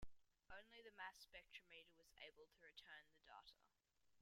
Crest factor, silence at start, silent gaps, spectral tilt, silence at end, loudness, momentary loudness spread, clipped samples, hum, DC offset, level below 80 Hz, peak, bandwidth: 22 dB; 0 s; none; -2.5 dB/octave; 0 s; -63 LUFS; 8 LU; under 0.1%; none; under 0.1%; -76 dBFS; -40 dBFS; 16 kHz